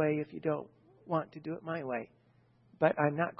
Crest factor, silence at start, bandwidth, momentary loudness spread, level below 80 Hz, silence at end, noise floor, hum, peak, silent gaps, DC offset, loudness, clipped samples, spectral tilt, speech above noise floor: 22 dB; 0 s; 5.6 kHz; 12 LU; -78 dBFS; 0.05 s; -67 dBFS; none; -12 dBFS; none; under 0.1%; -34 LUFS; under 0.1%; -6.5 dB/octave; 33 dB